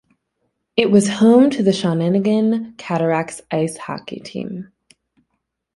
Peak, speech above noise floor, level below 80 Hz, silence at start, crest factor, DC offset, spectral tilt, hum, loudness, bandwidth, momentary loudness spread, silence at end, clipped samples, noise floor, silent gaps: -2 dBFS; 57 dB; -60 dBFS; 0.75 s; 16 dB; under 0.1%; -6 dB/octave; none; -17 LUFS; 11.5 kHz; 16 LU; 1.15 s; under 0.1%; -74 dBFS; none